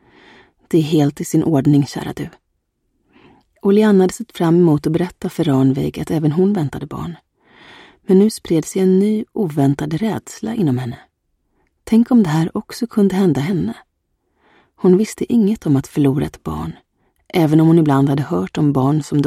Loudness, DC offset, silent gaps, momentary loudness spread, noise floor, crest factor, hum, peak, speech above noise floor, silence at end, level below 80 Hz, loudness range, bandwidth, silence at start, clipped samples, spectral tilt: -16 LUFS; under 0.1%; none; 13 LU; -69 dBFS; 14 dB; none; -2 dBFS; 54 dB; 0 s; -48 dBFS; 3 LU; 15.5 kHz; 0.7 s; under 0.1%; -7.5 dB/octave